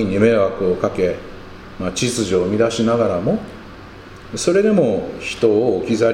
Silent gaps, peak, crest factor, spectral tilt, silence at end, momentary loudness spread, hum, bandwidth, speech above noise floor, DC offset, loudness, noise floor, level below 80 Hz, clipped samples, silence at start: none; -2 dBFS; 16 dB; -5.5 dB/octave; 0 s; 22 LU; none; 15 kHz; 20 dB; under 0.1%; -18 LUFS; -37 dBFS; -44 dBFS; under 0.1%; 0 s